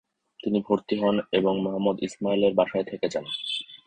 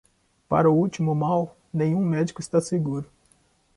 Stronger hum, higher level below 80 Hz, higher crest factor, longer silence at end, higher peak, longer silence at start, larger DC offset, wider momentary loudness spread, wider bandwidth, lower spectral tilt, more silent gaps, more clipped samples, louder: neither; about the same, -62 dBFS vs -60 dBFS; about the same, 18 dB vs 18 dB; second, 0.1 s vs 0.75 s; about the same, -6 dBFS vs -6 dBFS; about the same, 0.45 s vs 0.5 s; neither; second, 7 LU vs 10 LU; second, 9 kHz vs 11.5 kHz; second, -6 dB/octave vs -7.5 dB/octave; neither; neither; about the same, -26 LUFS vs -24 LUFS